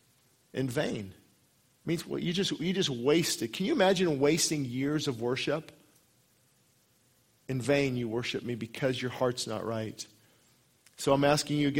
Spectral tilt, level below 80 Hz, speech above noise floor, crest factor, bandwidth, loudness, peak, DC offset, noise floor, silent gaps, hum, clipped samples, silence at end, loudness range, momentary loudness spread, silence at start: -4.5 dB/octave; -64 dBFS; 38 dB; 22 dB; 16 kHz; -30 LUFS; -10 dBFS; under 0.1%; -68 dBFS; none; none; under 0.1%; 0 s; 6 LU; 12 LU; 0.55 s